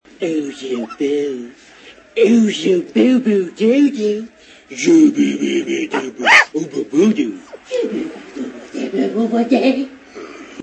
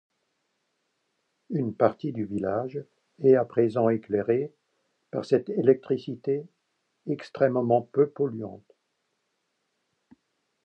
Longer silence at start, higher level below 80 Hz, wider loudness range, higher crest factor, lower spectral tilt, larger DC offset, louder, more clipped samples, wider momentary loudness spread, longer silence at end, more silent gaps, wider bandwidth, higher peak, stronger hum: second, 0.2 s vs 1.5 s; first, -62 dBFS vs -68 dBFS; about the same, 5 LU vs 4 LU; second, 16 dB vs 22 dB; second, -4.5 dB/octave vs -9 dB/octave; neither; first, -16 LUFS vs -26 LUFS; neither; first, 18 LU vs 14 LU; second, 0 s vs 2.1 s; neither; first, 11 kHz vs 8 kHz; first, 0 dBFS vs -6 dBFS; neither